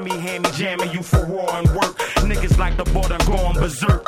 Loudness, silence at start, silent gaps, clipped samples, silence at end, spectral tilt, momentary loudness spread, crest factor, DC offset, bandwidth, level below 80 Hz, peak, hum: -20 LUFS; 0 s; none; under 0.1%; 0 s; -5.5 dB/octave; 4 LU; 16 dB; under 0.1%; 16.5 kHz; -22 dBFS; -2 dBFS; none